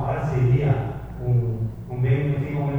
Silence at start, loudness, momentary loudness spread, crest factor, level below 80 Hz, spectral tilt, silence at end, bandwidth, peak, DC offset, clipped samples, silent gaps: 0 s; -23 LUFS; 9 LU; 14 dB; -40 dBFS; -10 dB/octave; 0 s; 3.8 kHz; -10 dBFS; under 0.1%; under 0.1%; none